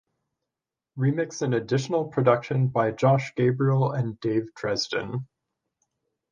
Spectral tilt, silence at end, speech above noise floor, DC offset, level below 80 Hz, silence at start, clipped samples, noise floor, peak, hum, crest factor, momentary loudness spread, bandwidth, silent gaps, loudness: -6.5 dB/octave; 1.1 s; 64 dB; under 0.1%; -64 dBFS; 0.95 s; under 0.1%; -88 dBFS; -6 dBFS; none; 20 dB; 6 LU; 7.4 kHz; none; -25 LUFS